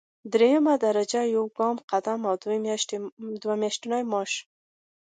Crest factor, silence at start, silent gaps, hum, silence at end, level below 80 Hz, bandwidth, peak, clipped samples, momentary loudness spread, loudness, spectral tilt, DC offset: 18 dB; 0.25 s; 1.84-1.88 s, 3.12-3.17 s; none; 0.65 s; -80 dBFS; 9.4 kHz; -8 dBFS; under 0.1%; 10 LU; -26 LUFS; -3.5 dB/octave; under 0.1%